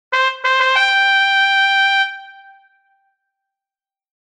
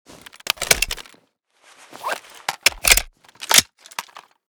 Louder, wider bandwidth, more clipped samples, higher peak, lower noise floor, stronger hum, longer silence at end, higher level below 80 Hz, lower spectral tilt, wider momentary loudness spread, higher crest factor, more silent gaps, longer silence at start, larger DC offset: first, -13 LUFS vs -18 LUFS; second, 11 kHz vs over 20 kHz; neither; about the same, -2 dBFS vs 0 dBFS; first, under -90 dBFS vs -61 dBFS; neither; first, 1.95 s vs 0.45 s; second, -72 dBFS vs -40 dBFS; second, 4 dB/octave vs 0.5 dB/octave; second, 5 LU vs 19 LU; second, 16 dB vs 24 dB; neither; second, 0.1 s vs 0.6 s; neither